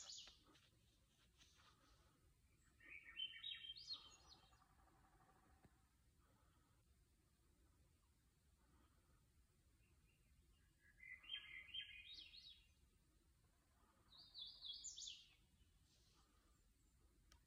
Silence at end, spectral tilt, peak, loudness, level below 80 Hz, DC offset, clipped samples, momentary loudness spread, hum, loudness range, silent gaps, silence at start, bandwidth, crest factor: 0 s; 0 dB/octave; -38 dBFS; -55 LUFS; -80 dBFS; under 0.1%; under 0.1%; 16 LU; none; 5 LU; none; 0 s; 15 kHz; 24 dB